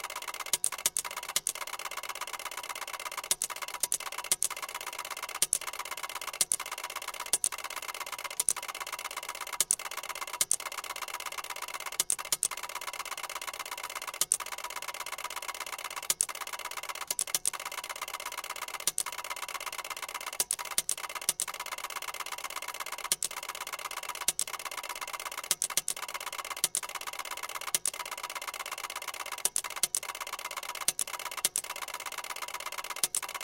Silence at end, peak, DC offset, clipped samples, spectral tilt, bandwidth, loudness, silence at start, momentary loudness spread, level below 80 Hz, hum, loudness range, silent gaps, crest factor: 0 s; -4 dBFS; under 0.1%; under 0.1%; 2 dB/octave; 17 kHz; -33 LUFS; 0 s; 8 LU; -70 dBFS; none; 2 LU; none; 32 dB